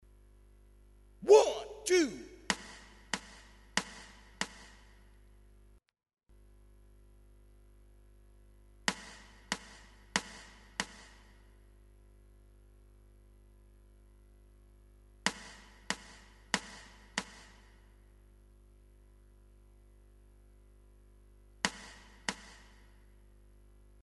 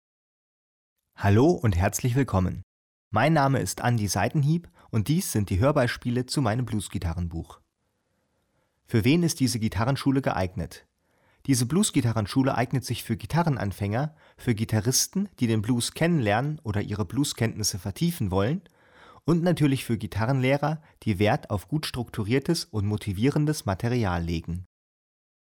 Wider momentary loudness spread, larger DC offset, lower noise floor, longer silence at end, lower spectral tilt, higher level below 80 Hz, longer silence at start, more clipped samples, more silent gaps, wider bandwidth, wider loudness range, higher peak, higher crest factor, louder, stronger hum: first, 25 LU vs 8 LU; neither; second, -62 dBFS vs -75 dBFS; first, 1.65 s vs 0.95 s; second, -2.5 dB/octave vs -5.5 dB/octave; second, -60 dBFS vs -48 dBFS; about the same, 1.2 s vs 1.2 s; neither; second, none vs 2.63-3.11 s; second, 11.5 kHz vs over 20 kHz; first, 17 LU vs 3 LU; about the same, -10 dBFS vs -12 dBFS; first, 28 dB vs 14 dB; second, -34 LUFS vs -26 LUFS; first, 50 Hz at -60 dBFS vs none